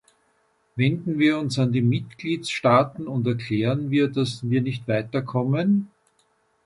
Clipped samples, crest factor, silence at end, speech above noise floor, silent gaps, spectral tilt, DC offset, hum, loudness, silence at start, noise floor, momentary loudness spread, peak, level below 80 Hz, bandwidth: under 0.1%; 18 dB; 0.8 s; 44 dB; none; -7 dB/octave; under 0.1%; none; -23 LUFS; 0.75 s; -66 dBFS; 7 LU; -4 dBFS; -60 dBFS; 11.5 kHz